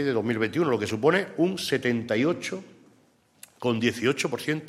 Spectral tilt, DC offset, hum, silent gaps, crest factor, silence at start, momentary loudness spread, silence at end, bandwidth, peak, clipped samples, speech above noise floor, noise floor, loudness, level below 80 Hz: -5 dB/octave; under 0.1%; none; none; 18 dB; 0 s; 7 LU; 0 s; 15 kHz; -8 dBFS; under 0.1%; 37 dB; -62 dBFS; -26 LUFS; -68 dBFS